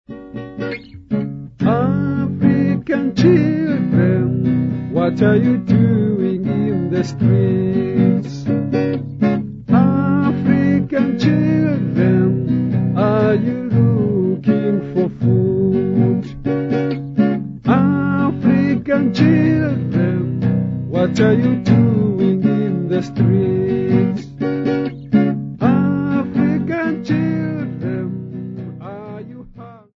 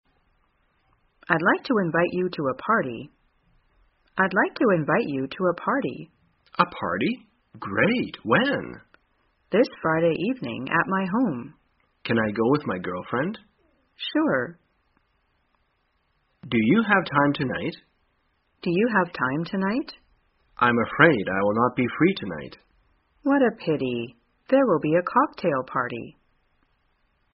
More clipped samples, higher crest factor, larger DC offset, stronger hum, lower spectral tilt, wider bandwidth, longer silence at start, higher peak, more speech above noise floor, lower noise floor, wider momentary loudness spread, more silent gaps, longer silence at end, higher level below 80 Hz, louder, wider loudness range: neither; second, 16 dB vs 24 dB; neither; neither; first, -9.5 dB/octave vs -4.5 dB/octave; first, 7.2 kHz vs 5.6 kHz; second, 0.1 s vs 1.3 s; about the same, 0 dBFS vs 0 dBFS; second, 24 dB vs 47 dB; second, -38 dBFS vs -70 dBFS; second, 9 LU vs 13 LU; neither; second, 0.2 s vs 1.25 s; first, -48 dBFS vs -62 dBFS; first, -17 LUFS vs -24 LUFS; about the same, 2 LU vs 4 LU